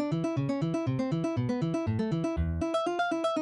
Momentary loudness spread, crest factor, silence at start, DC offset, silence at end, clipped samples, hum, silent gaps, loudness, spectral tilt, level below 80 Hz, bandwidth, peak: 1 LU; 10 dB; 0 s; under 0.1%; 0 s; under 0.1%; none; none; -30 LUFS; -7.5 dB/octave; -44 dBFS; 10.5 kHz; -20 dBFS